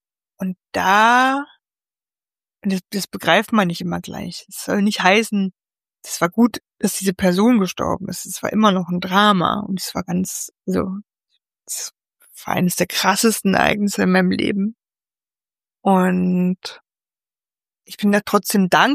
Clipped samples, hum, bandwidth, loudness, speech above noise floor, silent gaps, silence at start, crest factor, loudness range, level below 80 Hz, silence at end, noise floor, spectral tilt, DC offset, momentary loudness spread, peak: under 0.1%; none; 15.5 kHz; -19 LUFS; over 72 dB; none; 0.4 s; 18 dB; 4 LU; -54 dBFS; 0 s; under -90 dBFS; -4.5 dB/octave; under 0.1%; 14 LU; 0 dBFS